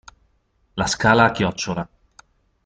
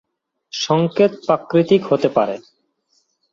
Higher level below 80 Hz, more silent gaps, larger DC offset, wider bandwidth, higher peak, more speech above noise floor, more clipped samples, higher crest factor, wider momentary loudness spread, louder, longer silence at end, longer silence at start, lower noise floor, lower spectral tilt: first, -48 dBFS vs -62 dBFS; neither; neither; first, 9.4 kHz vs 7.6 kHz; about the same, -2 dBFS vs -2 dBFS; about the same, 45 dB vs 48 dB; neither; about the same, 20 dB vs 18 dB; first, 17 LU vs 10 LU; about the same, -19 LUFS vs -17 LUFS; about the same, 0.8 s vs 0.9 s; first, 0.75 s vs 0.55 s; about the same, -64 dBFS vs -65 dBFS; second, -4.5 dB/octave vs -6 dB/octave